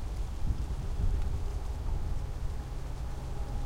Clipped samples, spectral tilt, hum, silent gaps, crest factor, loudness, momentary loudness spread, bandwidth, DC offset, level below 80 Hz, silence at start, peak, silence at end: under 0.1%; -6.5 dB/octave; none; none; 14 dB; -38 LUFS; 6 LU; 12 kHz; under 0.1%; -34 dBFS; 0 s; -18 dBFS; 0 s